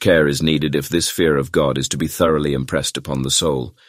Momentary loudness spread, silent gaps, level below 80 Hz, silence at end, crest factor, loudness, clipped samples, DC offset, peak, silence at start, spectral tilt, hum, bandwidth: 5 LU; none; -40 dBFS; 0.2 s; 16 dB; -18 LUFS; under 0.1%; under 0.1%; -2 dBFS; 0 s; -4 dB/octave; none; 16 kHz